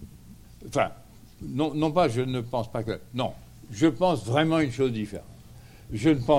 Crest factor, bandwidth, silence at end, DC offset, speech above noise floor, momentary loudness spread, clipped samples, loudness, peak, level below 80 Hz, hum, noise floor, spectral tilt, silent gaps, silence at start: 20 dB; 15.5 kHz; 0 s; under 0.1%; 23 dB; 18 LU; under 0.1%; -27 LUFS; -8 dBFS; -52 dBFS; none; -48 dBFS; -6.5 dB/octave; none; 0 s